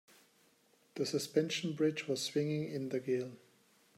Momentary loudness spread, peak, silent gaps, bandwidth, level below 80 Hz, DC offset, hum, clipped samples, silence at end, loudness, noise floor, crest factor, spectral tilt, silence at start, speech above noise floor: 6 LU; -18 dBFS; none; 16 kHz; -82 dBFS; under 0.1%; none; under 0.1%; 0.6 s; -36 LUFS; -70 dBFS; 20 dB; -5 dB/octave; 0.95 s; 35 dB